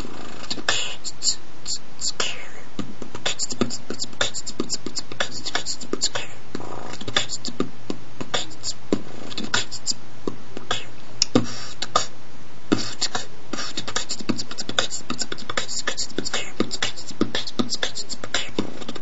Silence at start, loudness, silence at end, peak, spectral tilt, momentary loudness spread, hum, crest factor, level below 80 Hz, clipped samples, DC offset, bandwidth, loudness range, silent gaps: 0 s; -27 LUFS; 0 s; 0 dBFS; -2 dB/octave; 11 LU; none; 28 dB; -54 dBFS; under 0.1%; 10%; 8.2 kHz; 2 LU; none